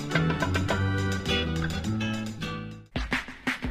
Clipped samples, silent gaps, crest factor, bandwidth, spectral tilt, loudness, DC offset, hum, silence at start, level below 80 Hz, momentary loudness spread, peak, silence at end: under 0.1%; none; 18 dB; 15.5 kHz; -5.5 dB/octave; -29 LUFS; under 0.1%; none; 0 s; -42 dBFS; 8 LU; -12 dBFS; 0 s